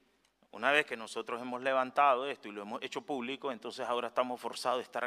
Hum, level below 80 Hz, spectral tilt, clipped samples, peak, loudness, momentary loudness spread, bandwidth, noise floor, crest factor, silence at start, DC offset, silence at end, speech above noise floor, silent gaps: none; -84 dBFS; -3 dB/octave; under 0.1%; -12 dBFS; -34 LUFS; 12 LU; 15 kHz; -71 dBFS; 24 dB; 0.55 s; under 0.1%; 0 s; 37 dB; none